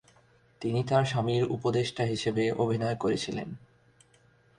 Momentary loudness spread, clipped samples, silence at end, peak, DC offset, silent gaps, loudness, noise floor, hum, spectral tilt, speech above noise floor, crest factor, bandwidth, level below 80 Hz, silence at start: 10 LU; under 0.1%; 1 s; -10 dBFS; under 0.1%; none; -29 LUFS; -63 dBFS; 60 Hz at -50 dBFS; -6 dB/octave; 35 dB; 20 dB; 11 kHz; -60 dBFS; 0.6 s